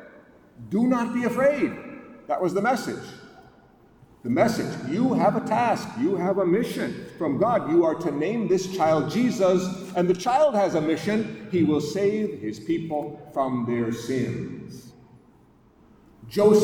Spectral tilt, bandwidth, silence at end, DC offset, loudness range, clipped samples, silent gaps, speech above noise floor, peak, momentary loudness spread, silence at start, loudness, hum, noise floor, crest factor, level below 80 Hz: -6.5 dB/octave; 19.5 kHz; 0 s; under 0.1%; 5 LU; under 0.1%; none; 33 dB; -8 dBFS; 11 LU; 0 s; -24 LUFS; none; -56 dBFS; 18 dB; -60 dBFS